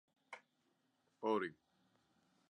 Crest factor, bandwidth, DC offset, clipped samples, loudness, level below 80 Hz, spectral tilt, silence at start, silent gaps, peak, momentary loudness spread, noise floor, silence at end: 22 dB; 10 kHz; under 0.1%; under 0.1%; -42 LUFS; under -90 dBFS; -6 dB/octave; 0.3 s; none; -26 dBFS; 19 LU; -81 dBFS; 0.95 s